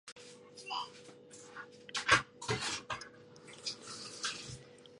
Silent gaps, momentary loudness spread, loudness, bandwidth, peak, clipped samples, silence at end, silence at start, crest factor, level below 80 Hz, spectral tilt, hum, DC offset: 0.12-0.16 s; 24 LU; -36 LUFS; 11.5 kHz; -10 dBFS; under 0.1%; 0 s; 0.05 s; 30 dB; -66 dBFS; -2 dB/octave; none; under 0.1%